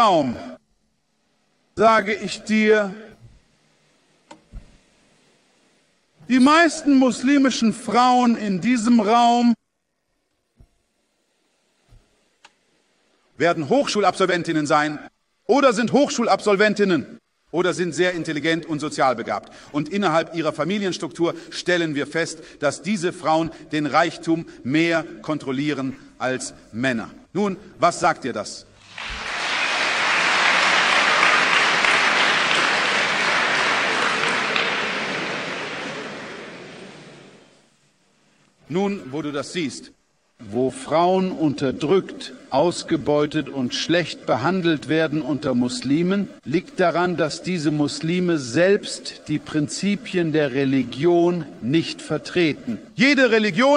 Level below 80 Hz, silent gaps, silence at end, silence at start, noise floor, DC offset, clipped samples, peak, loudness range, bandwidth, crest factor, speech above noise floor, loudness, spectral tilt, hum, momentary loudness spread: -58 dBFS; none; 0 s; 0 s; -75 dBFS; under 0.1%; under 0.1%; -2 dBFS; 9 LU; 11 kHz; 20 dB; 54 dB; -20 LUFS; -4.5 dB/octave; none; 13 LU